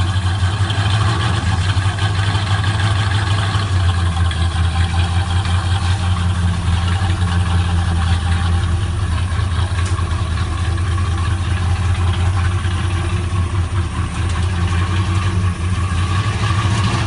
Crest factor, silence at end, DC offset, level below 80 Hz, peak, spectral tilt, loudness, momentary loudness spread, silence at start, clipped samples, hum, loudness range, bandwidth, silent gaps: 12 dB; 0 s; under 0.1%; -24 dBFS; -4 dBFS; -5.5 dB/octave; -18 LUFS; 3 LU; 0 s; under 0.1%; none; 2 LU; 11 kHz; none